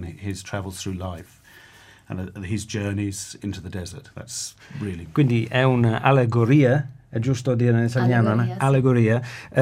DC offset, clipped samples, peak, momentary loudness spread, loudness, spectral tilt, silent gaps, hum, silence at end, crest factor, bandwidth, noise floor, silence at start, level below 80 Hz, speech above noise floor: under 0.1%; under 0.1%; -2 dBFS; 15 LU; -22 LUFS; -6.5 dB/octave; none; none; 0 s; 20 dB; 13.5 kHz; -49 dBFS; 0 s; -54 dBFS; 28 dB